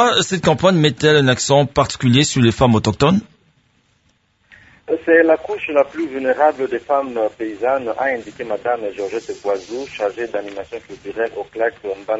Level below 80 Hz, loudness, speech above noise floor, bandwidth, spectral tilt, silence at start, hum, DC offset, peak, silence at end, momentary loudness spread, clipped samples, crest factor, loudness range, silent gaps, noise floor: -46 dBFS; -17 LUFS; 44 dB; 8 kHz; -5 dB/octave; 0 s; none; under 0.1%; 0 dBFS; 0 s; 12 LU; under 0.1%; 18 dB; 9 LU; none; -61 dBFS